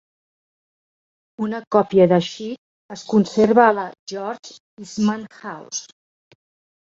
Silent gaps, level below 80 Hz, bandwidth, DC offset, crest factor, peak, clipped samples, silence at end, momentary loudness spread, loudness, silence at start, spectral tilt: 1.67-1.71 s, 2.58-2.89 s, 3.99-4.06 s, 4.39-4.43 s, 4.60-4.77 s; -62 dBFS; 7.8 kHz; under 0.1%; 20 dB; -2 dBFS; under 0.1%; 1 s; 21 LU; -19 LUFS; 1.4 s; -5.5 dB/octave